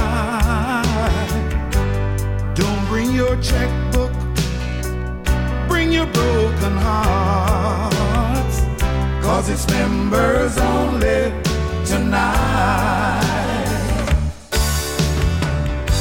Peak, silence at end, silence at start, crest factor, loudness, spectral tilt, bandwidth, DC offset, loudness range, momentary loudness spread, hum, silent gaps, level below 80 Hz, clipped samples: -4 dBFS; 0 s; 0 s; 14 dB; -19 LUFS; -5.5 dB/octave; 17 kHz; under 0.1%; 2 LU; 4 LU; none; none; -22 dBFS; under 0.1%